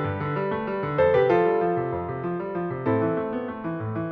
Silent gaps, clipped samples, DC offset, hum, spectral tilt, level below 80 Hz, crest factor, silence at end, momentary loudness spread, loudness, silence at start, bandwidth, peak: none; under 0.1%; under 0.1%; none; -7 dB/octave; -54 dBFS; 14 dB; 0 s; 10 LU; -25 LUFS; 0 s; 5.8 kHz; -10 dBFS